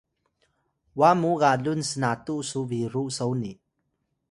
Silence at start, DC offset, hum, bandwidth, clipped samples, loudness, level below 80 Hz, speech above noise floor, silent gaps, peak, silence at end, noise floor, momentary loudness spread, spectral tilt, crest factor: 0.95 s; under 0.1%; none; 11.5 kHz; under 0.1%; -25 LUFS; -64 dBFS; 52 dB; none; -6 dBFS; 0.8 s; -76 dBFS; 10 LU; -5.5 dB/octave; 20 dB